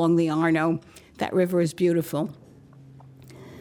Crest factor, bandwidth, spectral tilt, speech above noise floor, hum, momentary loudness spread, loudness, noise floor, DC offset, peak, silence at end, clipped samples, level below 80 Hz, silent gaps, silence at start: 14 dB; 18.5 kHz; -7 dB/octave; 26 dB; none; 11 LU; -24 LUFS; -49 dBFS; under 0.1%; -12 dBFS; 0 s; under 0.1%; -64 dBFS; none; 0 s